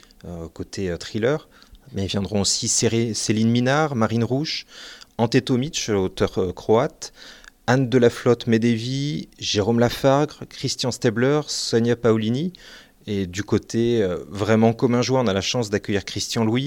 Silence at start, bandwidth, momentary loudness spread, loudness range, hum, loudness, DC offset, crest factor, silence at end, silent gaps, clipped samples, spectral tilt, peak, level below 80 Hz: 0.25 s; 17 kHz; 11 LU; 2 LU; none; -21 LUFS; under 0.1%; 18 dB; 0 s; none; under 0.1%; -5 dB/octave; -4 dBFS; -52 dBFS